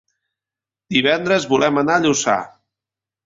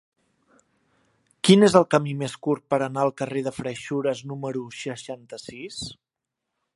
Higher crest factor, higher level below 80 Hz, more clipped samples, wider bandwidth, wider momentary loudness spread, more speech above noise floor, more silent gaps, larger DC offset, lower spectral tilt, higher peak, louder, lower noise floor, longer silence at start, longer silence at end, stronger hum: second, 18 dB vs 24 dB; about the same, -60 dBFS vs -62 dBFS; neither; second, 7.8 kHz vs 11.5 kHz; second, 5 LU vs 20 LU; first, 72 dB vs 61 dB; neither; neither; second, -3.5 dB/octave vs -5.5 dB/octave; about the same, -2 dBFS vs 0 dBFS; first, -17 LUFS vs -23 LUFS; first, -89 dBFS vs -85 dBFS; second, 0.9 s vs 1.45 s; about the same, 0.8 s vs 0.8 s; neither